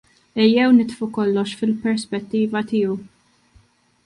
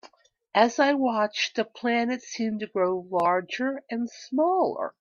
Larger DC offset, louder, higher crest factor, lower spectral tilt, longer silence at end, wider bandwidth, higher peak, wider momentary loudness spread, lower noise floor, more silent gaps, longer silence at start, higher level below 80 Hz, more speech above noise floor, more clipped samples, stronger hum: neither; first, -20 LUFS vs -26 LUFS; second, 16 dB vs 22 dB; first, -6 dB/octave vs -4 dB/octave; first, 1 s vs 0.1 s; first, 11 kHz vs 7.4 kHz; about the same, -4 dBFS vs -4 dBFS; about the same, 10 LU vs 8 LU; about the same, -56 dBFS vs -56 dBFS; neither; first, 0.35 s vs 0.05 s; first, -62 dBFS vs -76 dBFS; first, 37 dB vs 31 dB; neither; neither